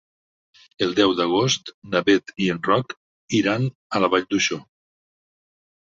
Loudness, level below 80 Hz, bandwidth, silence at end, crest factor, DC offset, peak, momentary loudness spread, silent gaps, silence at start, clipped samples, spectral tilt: -21 LUFS; -60 dBFS; 7.8 kHz; 1.3 s; 20 dB; under 0.1%; -4 dBFS; 6 LU; 1.74-1.82 s, 2.97-3.28 s, 3.75-3.90 s; 0.8 s; under 0.1%; -4.5 dB/octave